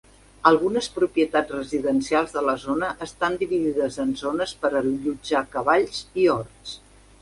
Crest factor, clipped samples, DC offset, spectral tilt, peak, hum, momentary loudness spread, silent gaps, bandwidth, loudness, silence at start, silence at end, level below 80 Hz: 22 dB; under 0.1%; under 0.1%; -4.5 dB/octave; -2 dBFS; none; 7 LU; none; 11.5 kHz; -23 LUFS; 0.45 s; 0.45 s; -54 dBFS